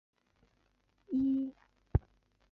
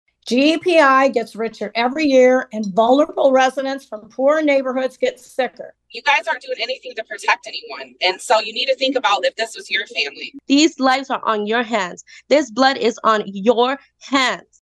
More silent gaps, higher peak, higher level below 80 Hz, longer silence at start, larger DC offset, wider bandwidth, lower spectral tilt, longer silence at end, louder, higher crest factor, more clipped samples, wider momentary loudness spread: neither; second, -14 dBFS vs 0 dBFS; first, -46 dBFS vs -66 dBFS; first, 1.1 s vs 0.25 s; neither; second, 4.1 kHz vs 12 kHz; first, -11.5 dB/octave vs -3 dB/octave; first, 0.55 s vs 0.2 s; second, -35 LUFS vs -17 LUFS; first, 24 dB vs 18 dB; neither; second, 6 LU vs 11 LU